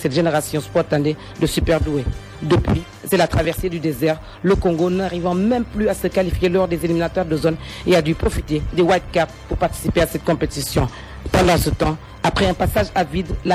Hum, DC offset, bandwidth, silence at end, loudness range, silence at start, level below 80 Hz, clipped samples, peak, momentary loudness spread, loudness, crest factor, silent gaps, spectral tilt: none; under 0.1%; 16 kHz; 0 s; 1 LU; 0 s; -30 dBFS; under 0.1%; -4 dBFS; 6 LU; -19 LUFS; 16 dB; none; -6 dB/octave